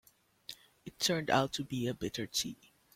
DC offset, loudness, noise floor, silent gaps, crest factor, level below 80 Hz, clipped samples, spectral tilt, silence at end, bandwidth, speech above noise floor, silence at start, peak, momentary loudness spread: under 0.1%; -34 LUFS; -54 dBFS; none; 22 dB; -66 dBFS; under 0.1%; -3.5 dB/octave; 0.4 s; 16.5 kHz; 20 dB; 0.5 s; -14 dBFS; 21 LU